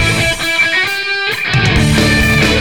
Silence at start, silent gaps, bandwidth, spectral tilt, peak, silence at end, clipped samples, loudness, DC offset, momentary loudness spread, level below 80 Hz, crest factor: 0 s; none; 19 kHz; -4 dB/octave; 0 dBFS; 0 s; under 0.1%; -11 LUFS; 1%; 4 LU; -24 dBFS; 12 dB